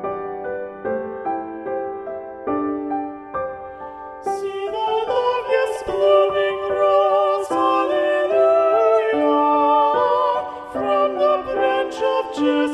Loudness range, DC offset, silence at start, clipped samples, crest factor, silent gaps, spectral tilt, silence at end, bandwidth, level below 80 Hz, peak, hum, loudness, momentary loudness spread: 10 LU; under 0.1%; 0 s; under 0.1%; 16 dB; none; -5 dB/octave; 0 s; 11.5 kHz; -56 dBFS; -4 dBFS; none; -20 LUFS; 12 LU